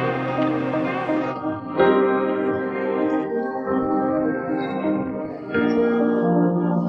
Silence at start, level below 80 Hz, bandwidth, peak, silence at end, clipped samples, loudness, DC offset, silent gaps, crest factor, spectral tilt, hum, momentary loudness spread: 0 s; -60 dBFS; 6 kHz; -4 dBFS; 0 s; under 0.1%; -22 LUFS; under 0.1%; none; 18 dB; -9 dB/octave; none; 6 LU